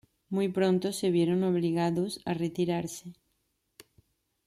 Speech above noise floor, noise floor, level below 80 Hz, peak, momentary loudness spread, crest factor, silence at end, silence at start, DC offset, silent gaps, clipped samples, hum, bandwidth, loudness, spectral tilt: 49 dB; -77 dBFS; -68 dBFS; -12 dBFS; 9 LU; 18 dB; 1.35 s; 0.3 s; under 0.1%; none; under 0.1%; none; 15 kHz; -29 LUFS; -6.5 dB/octave